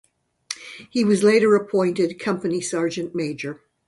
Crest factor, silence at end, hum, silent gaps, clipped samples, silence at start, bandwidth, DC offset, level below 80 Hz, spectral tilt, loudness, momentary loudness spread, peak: 18 dB; 0.35 s; none; none; under 0.1%; 0.5 s; 11.5 kHz; under 0.1%; -64 dBFS; -5 dB/octave; -21 LUFS; 17 LU; -4 dBFS